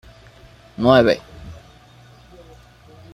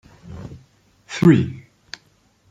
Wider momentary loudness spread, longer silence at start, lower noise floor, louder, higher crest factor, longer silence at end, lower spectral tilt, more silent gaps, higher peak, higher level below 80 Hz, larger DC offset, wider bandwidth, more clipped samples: about the same, 26 LU vs 25 LU; first, 0.8 s vs 0.25 s; second, -47 dBFS vs -59 dBFS; about the same, -16 LUFS vs -17 LUFS; about the same, 22 dB vs 20 dB; first, 1.6 s vs 0.9 s; about the same, -6.5 dB/octave vs -7.5 dB/octave; neither; about the same, 0 dBFS vs -2 dBFS; about the same, -48 dBFS vs -52 dBFS; neither; first, 13 kHz vs 9 kHz; neither